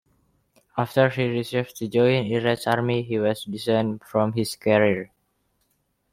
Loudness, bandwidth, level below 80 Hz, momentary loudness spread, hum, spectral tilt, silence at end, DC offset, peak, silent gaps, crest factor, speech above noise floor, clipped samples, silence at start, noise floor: -23 LUFS; 16 kHz; -62 dBFS; 8 LU; none; -6 dB/octave; 1.1 s; under 0.1%; -6 dBFS; none; 18 dB; 48 dB; under 0.1%; 0.75 s; -71 dBFS